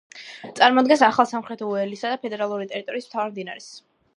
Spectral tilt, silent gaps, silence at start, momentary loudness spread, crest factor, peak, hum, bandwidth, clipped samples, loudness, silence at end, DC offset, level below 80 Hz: -4 dB/octave; none; 0.15 s; 21 LU; 22 dB; 0 dBFS; none; 11 kHz; under 0.1%; -22 LUFS; 0.35 s; under 0.1%; -74 dBFS